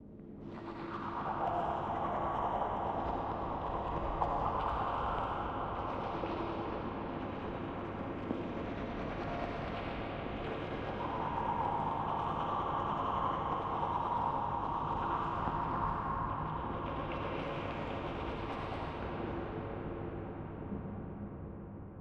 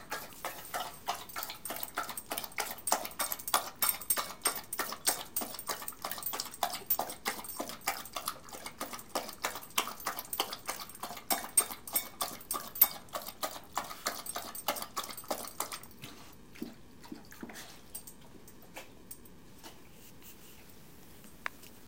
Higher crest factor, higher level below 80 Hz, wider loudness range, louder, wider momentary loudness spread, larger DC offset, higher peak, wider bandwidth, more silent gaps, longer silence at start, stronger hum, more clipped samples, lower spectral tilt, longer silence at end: second, 20 dB vs 30 dB; first, -50 dBFS vs -66 dBFS; second, 5 LU vs 17 LU; second, -38 LUFS vs -35 LUFS; second, 8 LU vs 21 LU; second, under 0.1% vs 0.2%; second, -18 dBFS vs -8 dBFS; second, 8.6 kHz vs 17 kHz; neither; about the same, 0 s vs 0 s; neither; neither; first, -8 dB/octave vs -0.5 dB/octave; about the same, 0 s vs 0 s